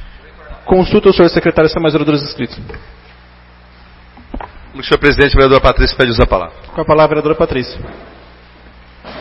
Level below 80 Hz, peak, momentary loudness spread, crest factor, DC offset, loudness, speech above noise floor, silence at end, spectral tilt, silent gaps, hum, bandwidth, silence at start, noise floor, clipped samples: -24 dBFS; 0 dBFS; 22 LU; 14 dB; under 0.1%; -11 LUFS; 29 dB; 0 s; -8 dB/octave; none; 60 Hz at -40 dBFS; 7.4 kHz; 0 s; -40 dBFS; under 0.1%